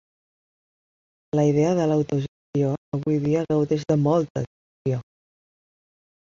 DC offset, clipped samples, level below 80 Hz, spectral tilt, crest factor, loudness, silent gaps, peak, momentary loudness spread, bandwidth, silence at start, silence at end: under 0.1%; under 0.1%; -60 dBFS; -8 dB/octave; 16 dB; -23 LUFS; 2.28-2.53 s, 2.78-2.92 s, 4.30-4.35 s, 4.47-4.85 s; -8 dBFS; 9 LU; 7.4 kHz; 1.35 s; 1.2 s